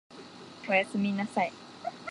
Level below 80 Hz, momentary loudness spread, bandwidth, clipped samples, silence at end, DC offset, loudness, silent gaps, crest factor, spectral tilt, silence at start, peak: -76 dBFS; 20 LU; 11 kHz; under 0.1%; 0 s; under 0.1%; -30 LUFS; none; 20 dB; -5.5 dB/octave; 0.1 s; -12 dBFS